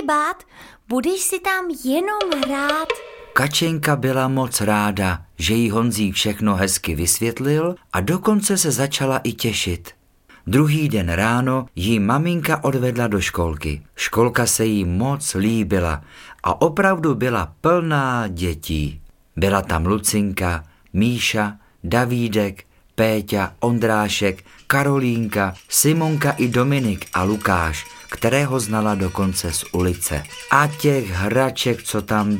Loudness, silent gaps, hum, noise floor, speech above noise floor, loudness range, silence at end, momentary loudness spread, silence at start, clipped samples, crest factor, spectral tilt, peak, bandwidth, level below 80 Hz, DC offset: -20 LUFS; none; none; -51 dBFS; 32 dB; 2 LU; 0 s; 7 LU; 0 s; under 0.1%; 20 dB; -4.5 dB/octave; 0 dBFS; 17 kHz; -40 dBFS; under 0.1%